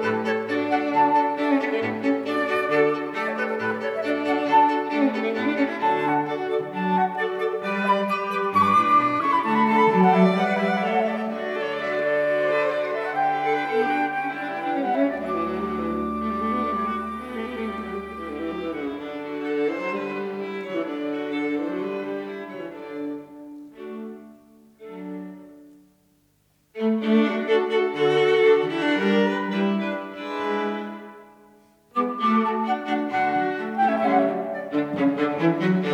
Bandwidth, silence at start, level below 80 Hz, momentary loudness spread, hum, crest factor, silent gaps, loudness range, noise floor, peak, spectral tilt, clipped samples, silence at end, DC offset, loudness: 12.5 kHz; 0 s; -60 dBFS; 13 LU; none; 16 dB; none; 10 LU; -64 dBFS; -6 dBFS; -7 dB/octave; under 0.1%; 0 s; under 0.1%; -23 LUFS